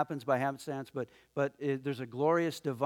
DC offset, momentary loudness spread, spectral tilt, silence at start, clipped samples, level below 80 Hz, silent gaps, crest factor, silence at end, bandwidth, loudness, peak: under 0.1%; 11 LU; -6.5 dB/octave; 0 s; under 0.1%; -78 dBFS; none; 18 dB; 0 s; 17.5 kHz; -34 LUFS; -16 dBFS